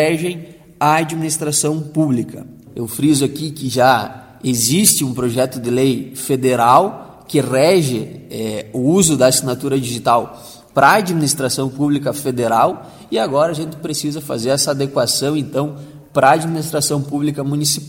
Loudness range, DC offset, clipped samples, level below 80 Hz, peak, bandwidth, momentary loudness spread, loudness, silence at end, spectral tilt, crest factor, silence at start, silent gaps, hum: 3 LU; under 0.1%; under 0.1%; -52 dBFS; 0 dBFS; 17 kHz; 12 LU; -16 LUFS; 0 s; -4 dB/octave; 16 dB; 0 s; none; none